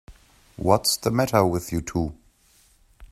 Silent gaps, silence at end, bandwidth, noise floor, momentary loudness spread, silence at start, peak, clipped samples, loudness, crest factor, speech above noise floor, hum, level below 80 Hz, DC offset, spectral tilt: none; 0.05 s; 15 kHz; -59 dBFS; 9 LU; 0.1 s; -2 dBFS; under 0.1%; -23 LUFS; 24 dB; 37 dB; none; -46 dBFS; under 0.1%; -4.5 dB/octave